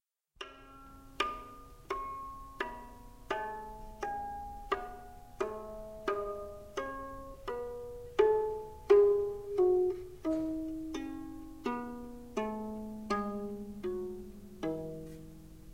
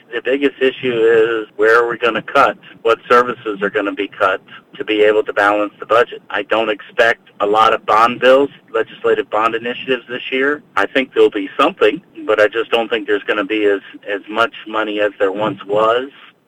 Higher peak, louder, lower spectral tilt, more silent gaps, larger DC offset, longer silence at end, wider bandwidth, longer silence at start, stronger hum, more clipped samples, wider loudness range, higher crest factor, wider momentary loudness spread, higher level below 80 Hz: second, -12 dBFS vs 0 dBFS; second, -35 LUFS vs -15 LUFS; first, -6 dB/octave vs -4.5 dB/octave; neither; first, 0.1% vs under 0.1%; second, 0 s vs 0.4 s; first, 16 kHz vs 10.5 kHz; about the same, 0 s vs 0.1 s; neither; neither; first, 11 LU vs 3 LU; first, 22 dB vs 14 dB; first, 20 LU vs 9 LU; about the same, -54 dBFS vs -58 dBFS